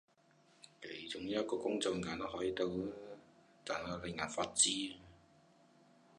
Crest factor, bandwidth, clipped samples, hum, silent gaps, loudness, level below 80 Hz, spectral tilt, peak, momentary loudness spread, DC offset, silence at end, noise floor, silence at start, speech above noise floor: 24 dB; 11 kHz; under 0.1%; none; none; -38 LUFS; -68 dBFS; -2.5 dB/octave; -16 dBFS; 20 LU; under 0.1%; 1.05 s; -70 dBFS; 0.65 s; 31 dB